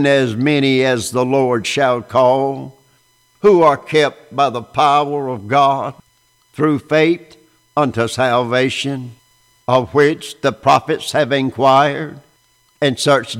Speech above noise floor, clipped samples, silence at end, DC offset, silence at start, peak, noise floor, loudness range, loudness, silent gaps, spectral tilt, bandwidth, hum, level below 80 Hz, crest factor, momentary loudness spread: 42 dB; under 0.1%; 0 s; under 0.1%; 0 s; -2 dBFS; -57 dBFS; 2 LU; -15 LUFS; none; -5 dB/octave; 15.5 kHz; none; -56 dBFS; 14 dB; 9 LU